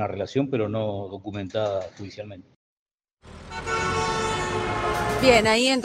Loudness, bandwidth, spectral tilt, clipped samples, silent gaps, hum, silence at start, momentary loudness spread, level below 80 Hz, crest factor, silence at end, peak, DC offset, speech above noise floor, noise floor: -24 LUFS; 16 kHz; -4.5 dB/octave; under 0.1%; 2.56-2.86 s, 2.94-2.98 s, 3.13-3.17 s; none; 0 s; 20 LU; -44 dBFS; 22 dB; 0 s; -4 dBFS; under 0.1%; 26 dB; -50 dBFS